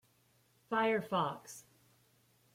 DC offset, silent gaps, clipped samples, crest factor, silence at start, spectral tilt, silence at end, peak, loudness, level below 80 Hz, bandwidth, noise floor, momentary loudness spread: under 0.1%; none; under 0.1%; 18 dB; 0.7 s; -5 dB/octave; 0.95 s; -20 dBFS; -35 LUFS; -84 dBFS; 16.5 kHz; -72 dBFS; 19 LU